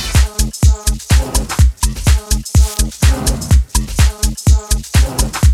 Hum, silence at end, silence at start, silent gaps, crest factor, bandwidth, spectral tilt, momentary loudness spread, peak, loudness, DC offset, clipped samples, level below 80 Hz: none; 0 s; 0 s; none; 12 dB; 16 kHz; -4 dB/octave; 3 LU; 0 dBFS; -15 LUFS; under 0.1%; under 0.1%; -14 dBFS